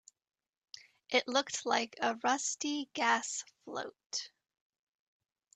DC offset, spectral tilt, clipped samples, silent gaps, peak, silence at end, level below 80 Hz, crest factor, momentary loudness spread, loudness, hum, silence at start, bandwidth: under 0.1%; -0.5 dB/octave; under 0.1%; 4.06-4.10 s; -14 dBFS; 1.3 s; -84 dBFS; 22 dB; 20 LU; -34 LUFS; none; 1.1 s; 9.4 kHz